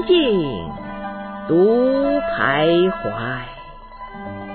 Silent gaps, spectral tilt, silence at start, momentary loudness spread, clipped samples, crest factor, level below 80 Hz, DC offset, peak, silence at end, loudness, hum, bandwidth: none; -10 dB/octave; 0 s; 19 LU; under 0.1%; 14 dB; -42 dBFS; under 0.1%; -4 dBFS; 0 s; -18 LUFS; none; 4.5 kHz